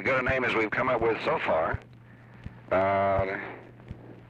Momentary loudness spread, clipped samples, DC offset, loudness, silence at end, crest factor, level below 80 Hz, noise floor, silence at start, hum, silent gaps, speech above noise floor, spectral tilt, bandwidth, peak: 21 LU; under 0.1%; under 0.1%; -27 LUFS; 0.05 s; 14 dB; -50 dBFS; -50 dBFS; 0 s; none; none; 24 dB; -7 dB/octave; 8.6 kHz; -14 dBFS